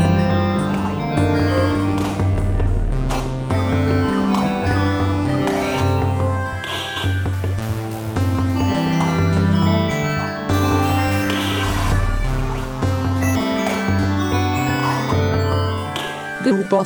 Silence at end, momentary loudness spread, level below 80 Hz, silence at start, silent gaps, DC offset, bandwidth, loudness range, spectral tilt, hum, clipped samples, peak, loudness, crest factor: 0 s; 6 LU; -30 dBFS; 0 s; none; under 0.1%; over 20 kHz; 2 LU; -6.5 dB/octave; none; under 0.1%; -4 dBFS; -19 LUFS; 14 dB